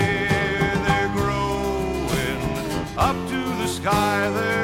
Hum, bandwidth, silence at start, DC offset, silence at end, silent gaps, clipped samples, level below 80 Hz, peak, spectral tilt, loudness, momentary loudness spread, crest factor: none; 16.5 kHz; 0 s; under 0.1%; 0 s; none; under 0.1%; -36 dBFS; -6 dBFS; -5 dB/octave; -22 LUFS; 5 LU; 16 dB